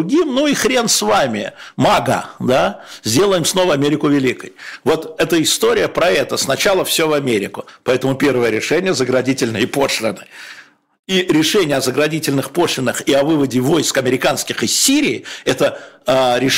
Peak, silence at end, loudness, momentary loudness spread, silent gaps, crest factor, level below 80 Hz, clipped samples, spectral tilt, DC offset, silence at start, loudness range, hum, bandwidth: -4 dBFS; 0 s; -15 LUFS; 7 LU; 10.99-11.03 s; 12 dB; -50 dBFS; under 0.1%; -3.5 dB/octave; under 0.1%; 0 s; 2 LU; none; 16.5 kHz